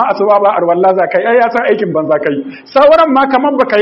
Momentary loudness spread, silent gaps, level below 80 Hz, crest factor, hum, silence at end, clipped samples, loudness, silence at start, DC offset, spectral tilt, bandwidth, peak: 6 LU; none; -52 dBFS; 10 dB; none; 0 s; 0.2%; -10 LUFS; 0 s; under 0.1%; -7.5 dB/octave; 6 kHz; 0 dBFS